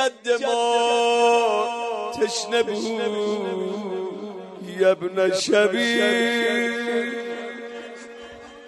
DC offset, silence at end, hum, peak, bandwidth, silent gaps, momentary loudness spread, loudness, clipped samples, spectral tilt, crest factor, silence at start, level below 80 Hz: under 0.1%; 0 s; none; -6 dBFS; 12 kHz; none; 17 LU; -22 LUFS; under 0.1%; -3 dB/octave; 16 dB; 0 s; -70 dBFS